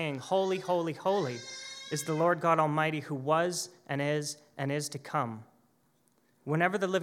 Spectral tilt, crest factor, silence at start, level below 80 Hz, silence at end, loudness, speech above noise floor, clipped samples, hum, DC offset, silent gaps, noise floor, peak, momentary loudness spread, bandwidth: -5 dB/octave; 20 dB; 0 s; -86 dBFS; 0 s; -31 LUFS; 40 dB; under 0.1%; none; under 0.1%; none; -70 dBFS; -12 dBFS; 12 LU; 16.5 kHz